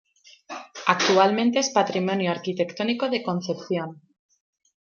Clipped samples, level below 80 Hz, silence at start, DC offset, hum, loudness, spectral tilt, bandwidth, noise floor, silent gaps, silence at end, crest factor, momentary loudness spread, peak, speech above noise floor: under 0.1%; -74 dBFS; 0.5 s; under 0.1%; none; -23 LUFS; -4 dB/octave; 7.4 kHz; -43 dBFS; none; 1.05 s; 22 dB; 14 LU; -4 dBFS; 20 dB